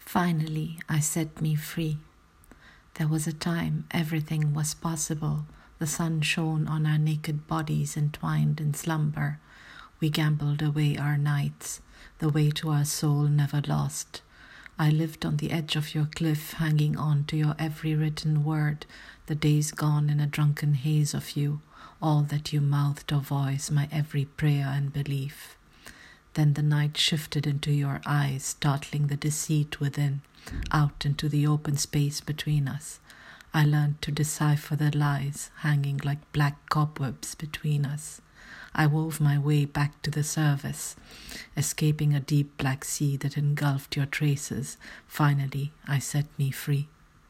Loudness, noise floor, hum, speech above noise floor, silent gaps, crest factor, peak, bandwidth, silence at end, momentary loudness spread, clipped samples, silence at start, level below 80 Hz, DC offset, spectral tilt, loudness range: -28 LUFS; -55 dBFS; none; 29 dB; none; 18 dB; -8 dBFS; 15.5 kHz; 0.45 s; 10 LU; under 0.1%; 0 s; -54 dBFS; under 0.1%; -5.5 dB/octave; 2 LU